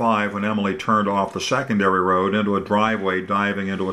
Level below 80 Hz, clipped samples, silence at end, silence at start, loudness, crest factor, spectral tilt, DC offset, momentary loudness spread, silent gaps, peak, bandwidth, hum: -58 dBFS; under 0.1%; 0 s; 0 s; -20 LUFS; 16 dB; -5.5 dB/octave; under 0.1%; 4 LU; none; -6 dBFS; 12 kHz; none